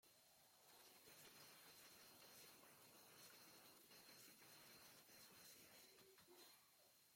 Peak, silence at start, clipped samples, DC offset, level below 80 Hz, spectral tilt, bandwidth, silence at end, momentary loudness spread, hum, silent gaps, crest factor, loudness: -52 dBFS; 0.05 s; under 0.1%; under 0.1%; under -90 dBFS; -1.5 dB/octave; 16.5 kHz; 0 s; 3 LU; none; none; 16 dB; -65 LUFS